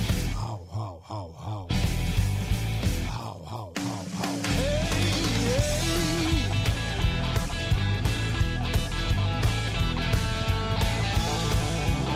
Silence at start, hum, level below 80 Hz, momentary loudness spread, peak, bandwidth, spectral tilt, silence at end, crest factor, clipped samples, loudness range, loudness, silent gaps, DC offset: 0 s; none; -32 dBFS; 10 LU; -12 dBFS; 16 kHz; -5 dB/octave; 0 s; 14 dB; under 0.1%; 4 LU; -27 LUFS; none; under 0.1%